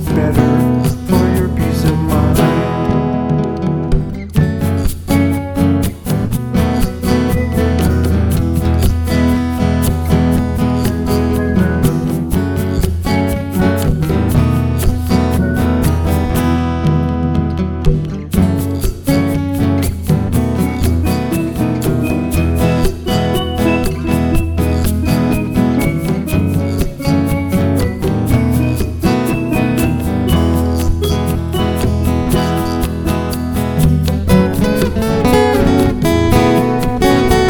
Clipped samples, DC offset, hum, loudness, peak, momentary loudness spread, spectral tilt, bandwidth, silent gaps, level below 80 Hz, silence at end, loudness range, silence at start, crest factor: under 0.1%; under 0.1%; none; -15 LUFS; 0 dBFS; 5 LU; -7 dB/octave; 19.5 kHz; none; -22 dBFS; 0 s; 2 LU; 0 s; 14 dB